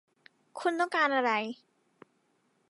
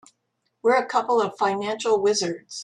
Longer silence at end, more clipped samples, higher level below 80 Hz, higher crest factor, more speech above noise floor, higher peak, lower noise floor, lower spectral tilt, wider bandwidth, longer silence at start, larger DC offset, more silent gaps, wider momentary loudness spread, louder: first, 1.15 s vs 0 s; neither; second, under -90 dBFS vs -70 dBFS; about the same, 20 dB vs 16 dB; second, 44 dB vs 52 dB; second, -14 dBFS vs -6 dBFS; about the same, -73 dBFS vs -75 dBFS; about the same, -3.5 dB/octave vs -3 dB/octave; about the same, 11.5 kHz vs 11 kHz; about the same, 0.55 s vs 0.65 s; neither; neither; first, 20 LU vs 5 LU; second, -29 LUFS vs -23 LUFS